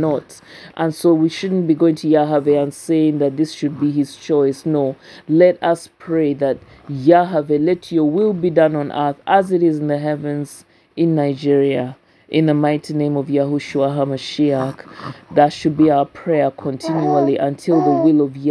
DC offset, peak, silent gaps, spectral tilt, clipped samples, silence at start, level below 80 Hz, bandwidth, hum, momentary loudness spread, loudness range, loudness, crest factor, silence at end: under 0.1%; 0 dBFS; none; -7.5 dB/octave; under 0.1%; 0 s; -60 dBFS; 11 kHz; none; 9 LU; 2 LU; -17 LUFS; 16 dB; 0 s